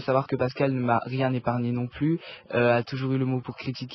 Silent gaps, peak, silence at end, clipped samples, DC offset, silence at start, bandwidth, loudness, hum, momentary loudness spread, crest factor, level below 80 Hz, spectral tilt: none; -10 dBFS; 0 s; under 0.1%; under 0.1%; 0 s; 6 kHz; -26 LUFS; none; 7 LU; 16 dB; -58 dBFS; -9 dB/octave